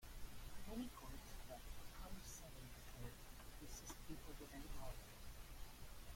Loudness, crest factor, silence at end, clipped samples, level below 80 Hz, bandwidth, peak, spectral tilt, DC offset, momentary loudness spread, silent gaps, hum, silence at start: -57 LUFS; 16 dB; 0 s; under 0.1%; -58 dBFS; 16.5 kHz; -38 dBFS; -4 dB/octave; under 0.1%; 6 LU; none; none; 0 s